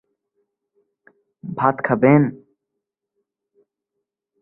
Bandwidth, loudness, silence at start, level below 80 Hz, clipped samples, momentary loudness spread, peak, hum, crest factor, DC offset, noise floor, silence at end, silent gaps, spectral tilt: 3.2 kHz; -17 LUFS; 1.45 s; -60 dBFS; under 0.1%; 17 LU; -2 dBFS; none; 22 dB; under 0.1%; -81 dBFS; 2.05 s; none; -12.5 dB/octave